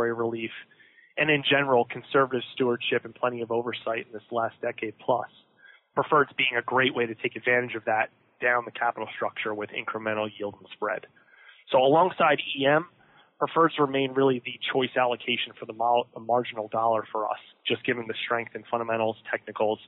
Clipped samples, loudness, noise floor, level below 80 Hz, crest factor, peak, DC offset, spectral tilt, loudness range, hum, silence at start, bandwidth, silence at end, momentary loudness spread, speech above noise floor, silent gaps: under 0.1%; -26 LUFS; -55 dBFS; -76 dBFS; 16 dB; -10 dBFS; under 0.1%; -2.5 dB/octave; 5 LU; none; 0 s; 4.2 kHz; 0 s; 11 LU; 28 dB; none